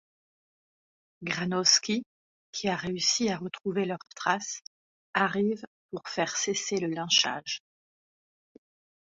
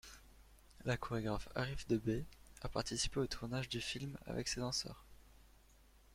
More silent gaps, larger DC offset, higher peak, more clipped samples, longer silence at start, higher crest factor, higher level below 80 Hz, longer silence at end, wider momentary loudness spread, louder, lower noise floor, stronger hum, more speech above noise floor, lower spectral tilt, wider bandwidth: first, 2.06-2.53 s, 4.67-5.13 s, 5.67-5.89 s vs none; neither; first, -8 dBFS vs -24 dBFS; neither; first, 1.2 s vs 0.05 s; about the same, 24 dB vs 20 dB; second, -70 dBFS vs -56 dBFS; first, 1.5 s vs 0.3 s; about the same, 14 LU vs 12 LU; first, -28 LUFS vs -41 LUFS; first, under -90 dBFS vs -66 dBFS; neither; first, over 61 dB vs 25 dB; second, -2.5 dB/octave vs -4 dB/octave; second, 7.8 kHz vs 16.5 kHz